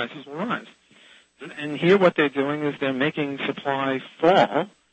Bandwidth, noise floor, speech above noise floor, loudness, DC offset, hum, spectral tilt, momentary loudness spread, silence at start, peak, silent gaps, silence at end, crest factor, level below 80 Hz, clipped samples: 8.4 kHz; -53 dBFS; 31 dB; -23 LUFS; under 0.1%; none; -6.5 dB/octave; 14 LU; 0 s; -6 dBFS; none; 0.25 s; 18 dB; -68 dBFS; under 0.1%